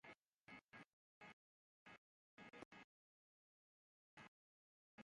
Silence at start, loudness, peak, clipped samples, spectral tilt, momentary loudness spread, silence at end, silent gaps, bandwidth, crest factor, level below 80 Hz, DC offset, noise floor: 0.05 s; -65 LUFS; -44 dBFS; under 0.1%; -4.5 dB/octave; 5 LU; 0 s; 0.20-0.45 s, 0.63-0.69 s, 0.88-1.21 s, 1.33-1.86 s, 1.98-2.37 s, 2.65-2.71 s, 2.84-4.17 s, 4.28-4.98 s; 9.6 kHz; 24 dB; under -90 dBFS; under 0.1%; under -90 dBFS